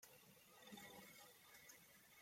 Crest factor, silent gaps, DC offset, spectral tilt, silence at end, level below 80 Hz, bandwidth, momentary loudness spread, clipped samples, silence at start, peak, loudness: 18 dB; none; under 0.1%; -2.5 dB/octave; 0 s; under -90 dBFS; 16.5 kHz; 7 LU; under 0.1%; 0 s; -46 dBFS; -62 LUFS